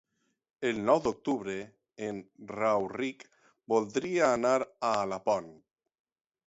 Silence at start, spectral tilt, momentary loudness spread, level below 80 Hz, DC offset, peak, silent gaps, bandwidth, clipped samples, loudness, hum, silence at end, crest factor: 0.6 s; -5 dB/octave; 12 LU; -68 dBFS; under 0.1%; -10 dBFS; none; 8 kHz; under 0.1%; -31 LUFS; none; 0.95 s; 20 dB